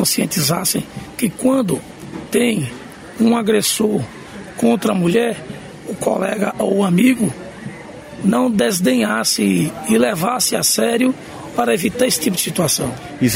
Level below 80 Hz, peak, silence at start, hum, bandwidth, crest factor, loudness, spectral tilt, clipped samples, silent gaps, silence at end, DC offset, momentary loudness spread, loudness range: -52 dBFS; -2 dBFS; 0 s; none; 16.5 kHz; 16 dB; -17 LUFS; -4 dB/octave; under 0.1%; none; 0 s; under 0.1%; 16 LU; 3 LU